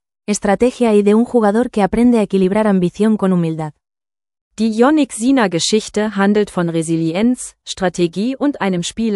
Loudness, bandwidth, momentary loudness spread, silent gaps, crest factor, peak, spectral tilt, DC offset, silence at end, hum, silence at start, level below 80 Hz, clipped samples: -15 LUFS; 12 kHz; 7 LU; 4.41-4.51 s; 14 dB; 0 dBFS; -5.5 dB/octave; under 0.1%; 0 s; none; 0.3 s; -46 dBFS; under 0.1%